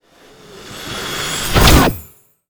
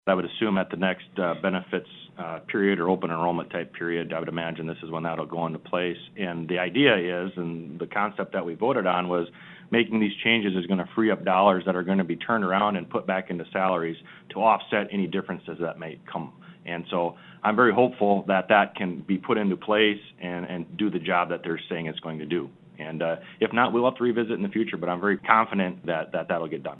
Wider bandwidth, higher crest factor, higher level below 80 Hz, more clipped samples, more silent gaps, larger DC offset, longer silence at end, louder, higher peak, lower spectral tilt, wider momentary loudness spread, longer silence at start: first, over 20 kHz vs 4.1 kHz; second, 16 dB vs 24 dB; first, -22 dBFS vs -70 dBFS; neither; neither; neither; first, 0.45 s vs 0 s; first, -14 LUFS vs -26 LUFS; about the same, 0 dBFS vs -2 dBFS; second, -4 dB/octave vs -9 dB/octave; first, 20 LU vs 13 LU; first, 0.55 s vs 0.05 s